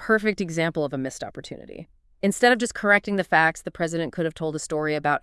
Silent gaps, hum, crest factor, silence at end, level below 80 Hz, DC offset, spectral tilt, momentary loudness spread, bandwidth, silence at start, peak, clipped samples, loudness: none; none; 20 dB; 0.05 s; -56 dBFS; under 0.1%; -4.5 dB/octave; 17 LU; 12 kHz; 0 s; -4 dBFS; under 0.1%; -23 LUFS